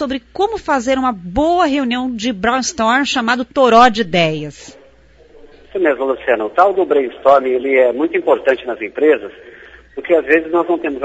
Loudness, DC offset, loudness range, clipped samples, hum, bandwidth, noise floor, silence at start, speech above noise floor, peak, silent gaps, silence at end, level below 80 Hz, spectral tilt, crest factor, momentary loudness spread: -15 LUFS; under 0.1%; 2 LU; under 0.1%; none; 8 kHz; -47 dBFS; 0 s; 32 dB; 0 dBFS; none; 0 s; -44 dBFS; -4 dB/octave; 16 dB; 8 LU